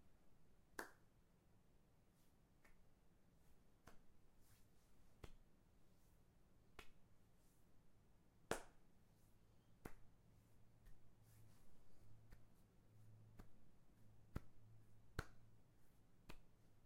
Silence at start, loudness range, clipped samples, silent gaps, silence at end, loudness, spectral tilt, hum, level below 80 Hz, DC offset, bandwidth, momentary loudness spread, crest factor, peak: 0 s; 6 LU; under 0.1%; none; 0 s; -59 LUFS; -4.5 dB/octave; none; -70 dBFS; under 0.1%; 16 kHz; 16 LU; 36 dB; -26 dBFS